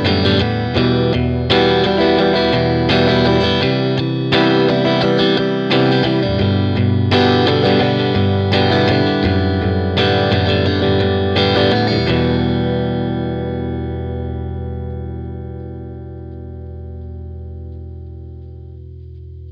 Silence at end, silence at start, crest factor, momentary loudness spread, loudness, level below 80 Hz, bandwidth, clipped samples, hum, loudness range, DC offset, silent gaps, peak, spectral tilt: 0 s; 0 s; 16 dB; 18 LU; -15 LUFS; -34 dBFS; 7.4 kHz; under 0.1%; none; 15 LU; under 0.1%; none; 0 dBFS; -7.5 dB/octave